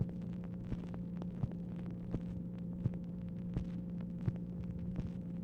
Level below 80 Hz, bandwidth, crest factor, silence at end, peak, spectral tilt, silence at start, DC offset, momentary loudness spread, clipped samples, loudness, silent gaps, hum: -52 dBFS; 4.7 kHz; 18 dB; 0 s; -22 dBFS; -10.5 dB/octave; 0 s; under 0.1%; 3 LU; under 0.1%; -42 LUFS; none; none